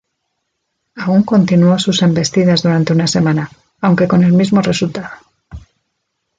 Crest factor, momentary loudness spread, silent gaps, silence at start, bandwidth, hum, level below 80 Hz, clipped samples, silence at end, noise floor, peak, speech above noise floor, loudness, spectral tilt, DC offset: 12 dB; 10 LU; none; 0.95 s; 9 kHz; none; -46 dBFS; under 0.1%; 0.8 s; -71 dBFS; -2 dBFS; 59 dB; -13 LUFS; -6 dB/octave; under 0.1%